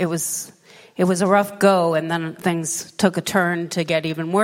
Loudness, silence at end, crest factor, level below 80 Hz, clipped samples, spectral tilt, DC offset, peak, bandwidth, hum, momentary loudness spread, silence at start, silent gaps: -20 LUFS; 0 s; 18 dB; -62 dBFS; under 0.1%; -4.5 dB/octave; under 0.1%; -2 dBFS; 16.5 kHz; none; 8 LU; 0 s; none